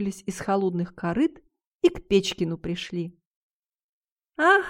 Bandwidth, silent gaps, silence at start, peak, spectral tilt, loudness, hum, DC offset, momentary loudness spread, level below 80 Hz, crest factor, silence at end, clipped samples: 16 kHz; 1.66-1.80 s, 3.25-3.63 s, 3.75-4.17 s; 0 s; -6 dBFS; -5.5 dB/octave; -26 LUFS; none; under 0.1%; 10 LU; -54 dBFS; 20 dB; 0 s; under 0.1%